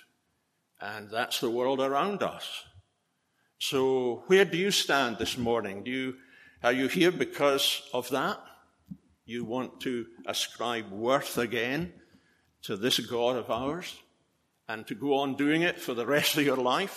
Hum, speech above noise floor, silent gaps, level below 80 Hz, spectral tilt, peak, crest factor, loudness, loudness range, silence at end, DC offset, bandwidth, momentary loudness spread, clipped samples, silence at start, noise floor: none; 47 dB; none; -66 dBFS; -3.5 dB/octave; -10 dBFS; 20 dB; -29 LUFS; 5 LU; 0 s; under 0.1%; 14.5 kHz; 14 LU; under 0.1%; 0.8 s; -76 dBFS